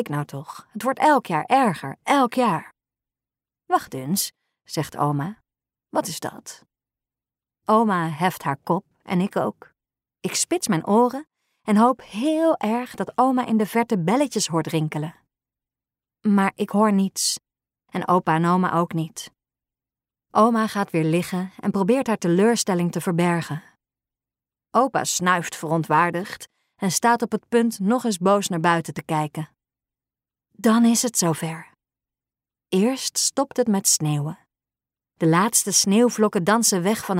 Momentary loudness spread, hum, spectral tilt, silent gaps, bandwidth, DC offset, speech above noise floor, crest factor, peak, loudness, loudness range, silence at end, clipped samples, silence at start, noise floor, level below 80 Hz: 12 LU; none; -4.5 dB/octave; none; 16 kHz; under 0.1%; over 69 dB; 18 dB; -4 dBFS; -21 LUFS; 4 LU; 0 s; under 0.1%; 0 s; under -90 dBFS; -68 dBFS